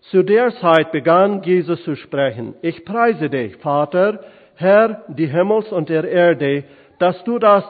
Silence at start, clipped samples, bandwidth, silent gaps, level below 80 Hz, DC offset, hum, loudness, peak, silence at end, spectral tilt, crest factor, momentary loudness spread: 0.15 s; under 0.1%; 4.8 kHz; none; -66 dBFS; under 0.1%; none; -17 LUFS; 0 dBFS; 0 s; -9 dB/octave; 16 dB; 9 LU